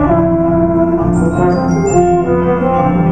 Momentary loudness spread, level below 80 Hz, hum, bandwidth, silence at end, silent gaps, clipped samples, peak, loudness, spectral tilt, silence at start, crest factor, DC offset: 2 LU; -30 dBFS; none; 9 kHz; 0 s; none; under 0.1%; 0 dBFS; -12 LUFS; -8.5 dB/octave; 0 s; 12 dB; 2%